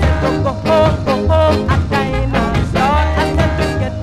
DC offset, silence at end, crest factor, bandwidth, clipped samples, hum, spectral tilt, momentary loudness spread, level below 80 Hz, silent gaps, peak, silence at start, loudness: under 0.1%; 0 s; 14 dB; 13 kHz; under 0.1%; none; -7 dB/octave; 4 LU; -22 dBFS; none; 0 dBFS; 0 s; -15 LUFS